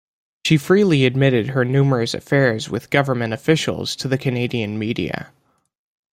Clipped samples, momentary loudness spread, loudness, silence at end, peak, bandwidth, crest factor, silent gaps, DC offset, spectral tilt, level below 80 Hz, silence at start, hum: under 0.1%; 9 LU; -19 LUFS; 0.85 s; -2 dBFS; 15.5 kHz; 18 dB; none; under 0.1%; -6 dB/octave; -54 dBFS; 0.45 s; none